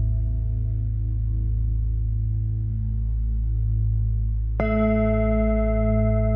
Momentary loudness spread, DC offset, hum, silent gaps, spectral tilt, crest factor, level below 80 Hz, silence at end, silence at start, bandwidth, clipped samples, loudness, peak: 5 LU; under 0.1%; none; none; -10 dB/octave; 12 dB; -24 dBFS; 0 s; 0 s; 3.1 kHz; under 0.1%; -24 LUFS; -10 dBFS